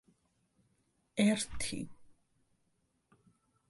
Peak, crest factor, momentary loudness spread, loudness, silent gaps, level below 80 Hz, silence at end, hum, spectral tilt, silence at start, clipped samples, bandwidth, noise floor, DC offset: -18 dBFS; 20 dB; 14 LU; -34 LUFS; none; -60 dBFS; 1.6 s; none; -4 dB/octave; 1.15 s; under 0.1%; 11.5 kHz; -78 dBFS; under 0.1%